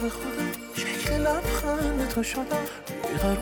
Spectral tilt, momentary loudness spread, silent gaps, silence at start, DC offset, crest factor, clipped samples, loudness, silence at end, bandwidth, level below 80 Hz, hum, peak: -4.5 dB/octave; 6 LU; none; 0 s; under 0.1%; 12 dB; under 0.1%; -28 LUFS; 0 s; over 20 kHz; -36 dBFS; none; -14 dBFS